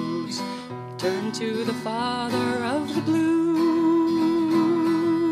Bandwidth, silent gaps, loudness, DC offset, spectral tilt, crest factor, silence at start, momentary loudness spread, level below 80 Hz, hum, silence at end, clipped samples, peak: 13.5 kHz; none; -23 LUFS; under 0.1%; -5.5 dB/octave; 12 dB; 0 s; 8 LU; -66 dBFS; none; 0 s; under 0.1%; -10 dBFS